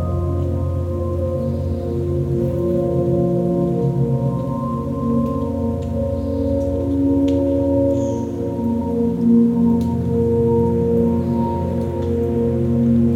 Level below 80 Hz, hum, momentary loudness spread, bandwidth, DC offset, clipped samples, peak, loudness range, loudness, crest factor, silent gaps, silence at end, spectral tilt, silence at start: -34 dBFS; none; 6 LU; 8 kHz; under 0.1%; under 0.1%; -4 dBFS; 3 LU; -19 LUFS; 14 dB; none; 0 s; -10.5 dB/octave; 0 s